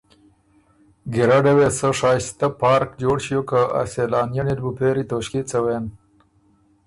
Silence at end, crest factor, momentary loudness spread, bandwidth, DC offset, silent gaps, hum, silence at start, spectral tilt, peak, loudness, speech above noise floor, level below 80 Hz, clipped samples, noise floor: 0.9 s; 16 dB; 9 LU; 11.5 kHz; under 0.1%; none; none; 1.05 s; -5.5 dB/octave; -4 dBFS; -20 LUFS; 39 dB; -48 dBFS; under 0.1%; -59 dBFS